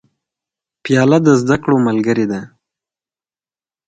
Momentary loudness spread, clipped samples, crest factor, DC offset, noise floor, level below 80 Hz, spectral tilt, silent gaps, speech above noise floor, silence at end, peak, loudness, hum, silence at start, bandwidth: 11 LU; under 0.1%; 16 dB; under 0.1%; under -90 dBFS; -52 dBFS; -7 dB/octave; none; over 77 dB; 1.4 s; 0 dBFS; -14 LUFS; none; 0.85 s; 9.2 kHz